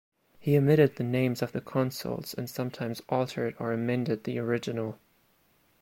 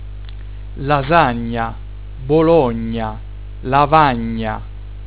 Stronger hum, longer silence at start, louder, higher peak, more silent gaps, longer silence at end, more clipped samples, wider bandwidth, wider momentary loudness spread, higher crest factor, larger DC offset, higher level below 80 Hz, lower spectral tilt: second, none vs 50 Hz at -30 dBFS; first, 0.4 s vs 0 s; second, -29 LUFS vs -16 LUFS; second, -10 dBFS vs 0 dBFS; neither; first, 0.85 s vs 0 s; neither; first, 16.5 kHz vs 4 kHz; second, 12 LU vs 21 LU; about the same, 20 dB vs 18 dB; second, under 0.1% vs 1%; second, -66 dBFS vs -30 dBFS; second, -7 dB/octave vs -10.5 dB/octave